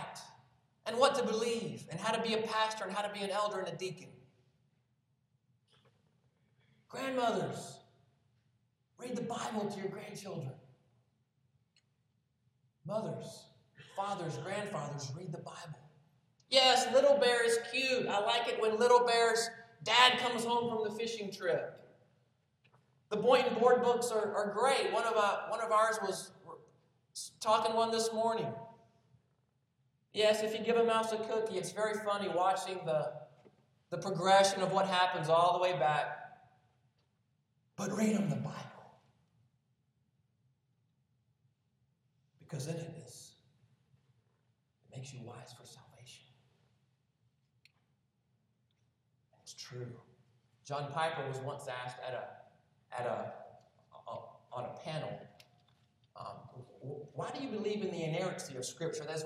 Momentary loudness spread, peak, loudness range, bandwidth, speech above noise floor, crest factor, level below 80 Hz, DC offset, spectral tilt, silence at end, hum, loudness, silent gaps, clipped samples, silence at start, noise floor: 21 LU; -12 dBFS; 19 LU; 14.5 kHz; 45 dB; 24 dB; -84 dBFS; under 0.1%; -3.5 dB/octave; 0 s; none; -33 LUFS; none; under 0.1%; 0 s; -78 dBFS